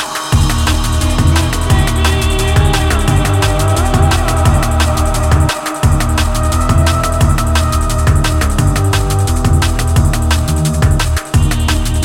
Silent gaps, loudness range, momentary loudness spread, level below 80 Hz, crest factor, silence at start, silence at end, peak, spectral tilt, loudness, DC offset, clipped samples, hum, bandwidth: none; 1 LU; 2 LU; -16 dBFS; 12 dB; 0 s; 0 s; 0 dBFS; -5 dB/octave; -13 LUFS; under 0.1%; under 0.1%; none; 16.5 kHz